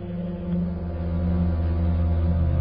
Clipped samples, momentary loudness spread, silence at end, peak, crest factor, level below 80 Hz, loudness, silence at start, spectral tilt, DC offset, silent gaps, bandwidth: under 0.1%; 6 LU; 0 s; -12 dBFS; 10 dB; -26 dBFS; -25 LUFS; 0 s; -13.5 dB/octave; under 0.1%; none; 4.7 kHz